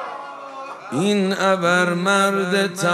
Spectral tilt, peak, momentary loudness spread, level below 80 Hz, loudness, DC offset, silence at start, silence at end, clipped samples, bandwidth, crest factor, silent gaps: -4.5 dB/octave; -2 dBFS; 16 LU; -74 dBFS; -19 LUFS; under 0.1%; 0 s; 0 s; under 0.1%; 14 kHz; 18 dB; none